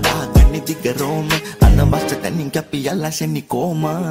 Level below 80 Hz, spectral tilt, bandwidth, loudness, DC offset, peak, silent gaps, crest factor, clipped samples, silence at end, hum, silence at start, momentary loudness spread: -20 dBFS; -5.5 dB/octave; 16.5 kHz; -17 LUFS; under 0.1%; -2 dBFS; none; 14 dB; under 0.1%; 0 s; none; 0 s; 8 LU